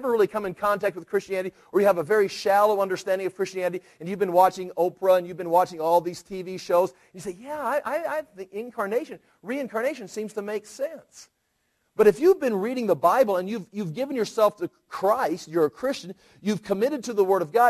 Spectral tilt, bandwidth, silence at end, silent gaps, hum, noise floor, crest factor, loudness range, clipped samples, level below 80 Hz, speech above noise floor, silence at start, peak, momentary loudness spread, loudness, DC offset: -5.5 dB/octave; 14.5 kHz; 0 s; none; none; -73 dBFS; 18 dB; 7 LU; under 0.1%; -68 dBFS; 49 dB; 0 s; -6 dBFS; 14 LU; -25 LUFS; under 0.1%